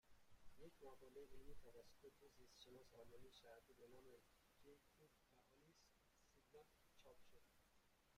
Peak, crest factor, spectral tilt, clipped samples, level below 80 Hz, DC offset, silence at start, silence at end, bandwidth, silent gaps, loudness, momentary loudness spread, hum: -46 dBFS; 18 dB; -4 dB/octave; under 0.1%; -76 dBFS; under 0.1%; 0.05 s; 0 s; 15.5 kHz; none; -67 LUFS; 4 LU; none